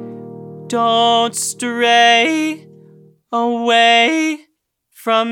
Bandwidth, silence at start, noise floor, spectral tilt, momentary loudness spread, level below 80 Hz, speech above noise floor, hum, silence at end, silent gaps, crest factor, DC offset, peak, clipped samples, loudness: 17.5 kHz; 0 s; -65 dBFS; -2 dB/octave; 21 LU; -82 dBFS; 51 dB; none; 0 s; none; 14 dB; under 0.1%; -2 dBFS; under 0.1%; -14 LUFS